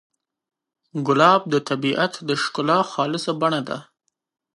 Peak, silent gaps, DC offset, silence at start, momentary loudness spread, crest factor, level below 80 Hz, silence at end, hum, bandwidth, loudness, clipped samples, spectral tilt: -2 dBFS; none; under 0.1%; 0.95 s; 12 LU; 22 dB; -72 dBFS; 0.75 s; none; 11.5 kHz; -20 LUFS; under 0.1%; -5 dB/octave